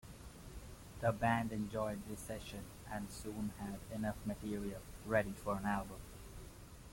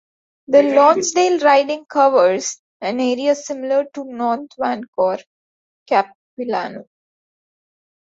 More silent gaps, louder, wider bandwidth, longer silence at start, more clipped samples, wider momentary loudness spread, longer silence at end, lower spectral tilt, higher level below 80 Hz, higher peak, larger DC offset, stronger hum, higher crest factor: second, none vs 2.59-2.80 s, 4.88-4.93 s, 5.26-5.86 s, 6.15-6.37 s; second, -41 LUFS vs -17 LUFS; first, 16.5 kHz vs 8 kHz; second, 0.05 s vs 0.5 s; neither; first, 18 LU vs 14 LU; second, 0 s vs 1.2 s; first, -6 dB/octave vs -3 dB/octave; first, -56 dBFS vs -68 dBFS; second, -20 dBFS vs -2 dBFS; neither; neither; about the same, 22 dB vs 18 dB